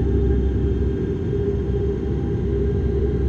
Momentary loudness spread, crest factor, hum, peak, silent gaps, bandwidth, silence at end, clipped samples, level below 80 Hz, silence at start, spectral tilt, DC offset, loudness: 3 LU; 14 dB; none; -8 dBFS; none; 4.3 kHz; 0 s; under 0.1%; -24 dBFS; 0 s; -10.5 dB/octave; under 0.1%; -22 LUFS